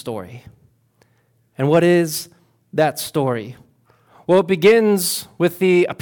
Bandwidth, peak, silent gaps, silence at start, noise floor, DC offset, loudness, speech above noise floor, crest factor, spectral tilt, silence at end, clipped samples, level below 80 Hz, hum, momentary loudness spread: 18 kHz; -4 dBFS; none; 0.05 s; -61 dBFS; under 0.1%; -17 LUFS; 44 dB; 14 dB; -5 dB/octave; 0.1 s; under 0.1%; -62 dBFS; none; 18 LU